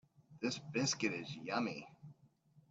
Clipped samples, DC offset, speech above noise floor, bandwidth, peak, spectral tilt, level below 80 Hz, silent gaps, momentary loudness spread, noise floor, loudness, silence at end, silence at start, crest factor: under 0.1%; under 0.1%; 29 dB; 8.8 kHz; -22 dBFS; -3.5 dB/octave; -80 dBFS; none; 21 LU; -69 dBFS; -39 LUFS; 0.1 s; 0.3 s; 20 dB